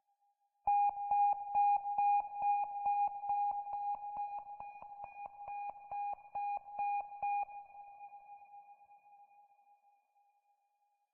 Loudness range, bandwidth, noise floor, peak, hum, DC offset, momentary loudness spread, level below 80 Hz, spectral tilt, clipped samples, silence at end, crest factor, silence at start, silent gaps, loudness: 11 LU; 2.8 kHz; -80 dBFS; -24 dBFS; none; under 0.1%; 21 LU; -78 dBFS; -2.5 dB/octave; under 0.1%; 1.9 s; 14 dB; 0.65 s; none; -36 LUFS